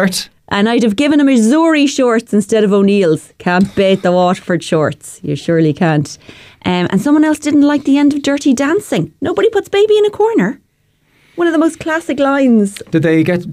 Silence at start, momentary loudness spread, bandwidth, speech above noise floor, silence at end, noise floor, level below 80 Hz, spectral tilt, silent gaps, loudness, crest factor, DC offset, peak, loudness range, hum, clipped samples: 0 s; 8 LU; 15 kHz; 46 dB; 0 s; -58 dBFS; -52 dBFS; -6 dB/octave; none; -13 LUFS; 10 dB; under 0.1%; -2 dBFS; 3 LU; none; under 0.1%